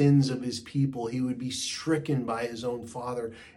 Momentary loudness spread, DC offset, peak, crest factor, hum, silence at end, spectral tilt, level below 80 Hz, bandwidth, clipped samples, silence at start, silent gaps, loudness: 8 LU; under 0.1%; -12 dBFS; 16 dB; none; 0.05 s; -6 dB/octave; -64 dBFS; 12 kHz; under 0.1%; 0 s; none; -30 LUFS